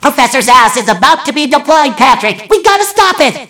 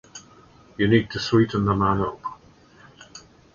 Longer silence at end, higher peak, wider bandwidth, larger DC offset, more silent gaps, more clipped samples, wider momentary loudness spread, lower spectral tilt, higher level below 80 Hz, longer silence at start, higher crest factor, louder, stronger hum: second, 0.05 s vs 0.35 s; first, 0 dBFS vs -4 dBFS; first, over 20 kHz vs 7.4 kHz; neither; neither; first, 5% vs under 0.1%; second, 5 LU vs 23 LU; second, -2 dB/octave vs -6.5 dB/octave; about the same, -42 dBFS vs -46 dBFS; second, 0 s vs 0.15 s; second, 8 dB vs 20 dB; first, -8 LUFS vs -22 LUFS; neither